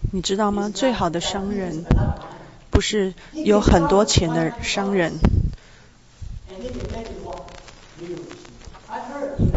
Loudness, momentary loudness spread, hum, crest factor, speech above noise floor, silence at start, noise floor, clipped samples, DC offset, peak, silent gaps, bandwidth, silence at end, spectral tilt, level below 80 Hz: -21 LUFS; 23 LU; none; 22 dB; 29 dB; 0 s; -49 dBFS; under 0.1%; 0.1%; 0 dBFS; none; 8 kHz; 0 s; -5.5 dB/octave; -30 dBFS